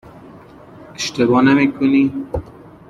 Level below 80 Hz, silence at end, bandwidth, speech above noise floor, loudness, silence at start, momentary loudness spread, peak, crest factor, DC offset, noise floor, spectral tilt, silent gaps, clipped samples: -44 dBFS; 0.4 s; 9.6 kHz; 25 dB; -16 LUFS; 0.8 s; 15 LU; -2 dBFS; 16 dB; under 0.1%; -41 dBFS; -5.5 dB/octave; none; under 0.1%